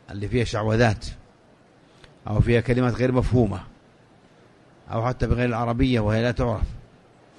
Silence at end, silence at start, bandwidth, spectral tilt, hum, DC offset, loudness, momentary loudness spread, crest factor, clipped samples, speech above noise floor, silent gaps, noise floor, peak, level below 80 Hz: 0.6 s; 0.1 s; 10.5 kHz; -7.5 dB/octave; none; under 0.1%; -23 LUFS; 12 LU; 20 dB; under 0.1%; 33 dB; none; -55 dBFS; -4 dBFS; -36 dBFS